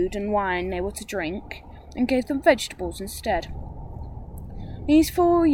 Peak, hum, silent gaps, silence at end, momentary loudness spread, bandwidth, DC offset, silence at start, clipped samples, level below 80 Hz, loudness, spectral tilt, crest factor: -4 dBFS; none; none; 0 s; 19 LU; 17 kHz; under 0.1%; 0 s; under 0.1%; -40 dBFS; -24 LUFS; -5 dB/octave; 20 dB